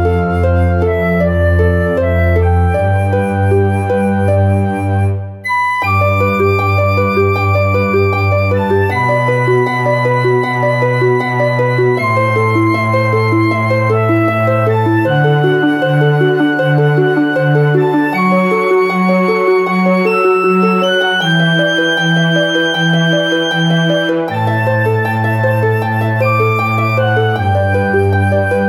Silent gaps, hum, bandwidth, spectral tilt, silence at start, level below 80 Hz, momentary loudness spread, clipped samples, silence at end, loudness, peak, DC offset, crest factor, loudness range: none; none; 13.5 kHz; -7 dB/octave; 0 s; -34 dBFS; 2 LU; under 0.1%; 0 s; -12 LUFS; 0 dBFS; under 0.1%; 12 dB; 2 LU